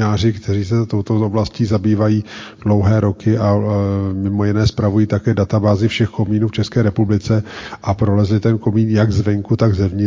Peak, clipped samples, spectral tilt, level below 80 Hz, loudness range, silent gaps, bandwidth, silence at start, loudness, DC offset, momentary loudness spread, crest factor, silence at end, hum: -2 dBFS; under 0.1%; -8 dB/octave; -34 dBFS; 1 LU; none; 7.6 kHz; 0 s; -16 LUFS; 0.1%; 4 LU; 14 dB; 0 s; none